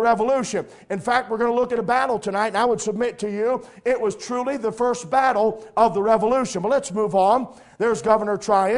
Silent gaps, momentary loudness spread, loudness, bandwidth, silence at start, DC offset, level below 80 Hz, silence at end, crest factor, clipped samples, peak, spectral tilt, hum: none; 7 LU; -21 LUFS; 11 kHz; 0 s; under 0.1%; -56 dBFS; 0 s; 18 dB; under 0.1%; -2 dBFS; -4.5 dB/octave; none